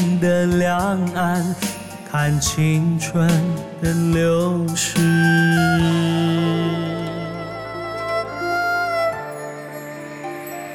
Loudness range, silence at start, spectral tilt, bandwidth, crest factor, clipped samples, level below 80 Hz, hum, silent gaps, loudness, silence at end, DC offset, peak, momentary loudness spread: 7 LU; 0 s; -5.5 dB/octave; 16.5 kHz; 14 dB; under 0.1%; -44 dBFS; none; none; -19 LUFS; 0 s; under 0.1%; -6 dBFS; 14 LU